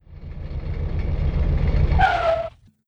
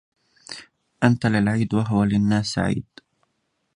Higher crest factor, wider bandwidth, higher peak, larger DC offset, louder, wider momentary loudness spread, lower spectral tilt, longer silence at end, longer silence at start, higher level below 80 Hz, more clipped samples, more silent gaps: about the same, 16 dB vs 20 dB; second, 7 kHz vs 10.5 kHz; second, -6 dBFS vs -2 dBFS; neither; about the same, -22 LUFS vs -21 LUFS; second, 15 LU vs 18 LU; first, -8 dB/octave vs -6.5 dB/octave; second, 0.4 s vs 0.95 s; second, 0.1 s vs 0.5 s; first, -24 dBFS vs -48 dBFS; neither; neither